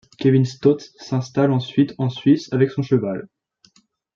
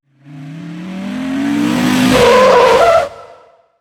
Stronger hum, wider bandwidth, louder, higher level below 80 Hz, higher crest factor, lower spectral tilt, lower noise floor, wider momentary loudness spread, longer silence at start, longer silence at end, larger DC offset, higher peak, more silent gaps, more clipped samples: neither; second, 7.2 kHz vs 18 kHz; second, -20 LUFS vs -10 LUFS; second, -62 dBFS vs -40 dBFS; about the same, 16 dB vs 12 dB; first, -8 dB/octave vs -4.5 dB/octave; first, -60 dBFS vs -44 dBFS; second, 8 LU vs 20 LU; about the same, 0.2 s vs 0.3 s; first, 0.9 s vs 0.55 s; neither; second, -4 dBFS vs 0 dBFS; neither; neither